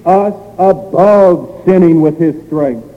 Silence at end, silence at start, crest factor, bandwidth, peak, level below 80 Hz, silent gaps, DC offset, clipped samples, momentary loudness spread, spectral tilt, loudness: 0.1 s; 0.05 s; 10 dB; 8.6 kHz; 0 dBFS; -46 dBFS; none; under 0.1%; under 0.1%; 9 LU; -10 dB/octave; -10 LUFS